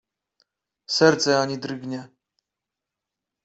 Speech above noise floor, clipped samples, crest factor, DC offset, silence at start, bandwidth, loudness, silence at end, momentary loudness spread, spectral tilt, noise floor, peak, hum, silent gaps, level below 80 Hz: 65 dB; under 0.1%; 24 dB; under 0.1%; 0.9 s; 8.2 kHz; -21 LUFS; 1.4 s; 16 LU; -4 dB/octave; -86 dBFS; -2 dBFS; none; none; -68 dBFS